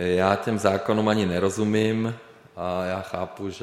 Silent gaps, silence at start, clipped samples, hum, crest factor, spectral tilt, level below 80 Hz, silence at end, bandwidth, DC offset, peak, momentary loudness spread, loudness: none; 0 s; under 0.1%; none; 20 dB; -6 dB/octave; -56 dBFS; 0 s; 13.5 kHz; under 0.1%; -4 dBFS; 11 LU; -24 LUFS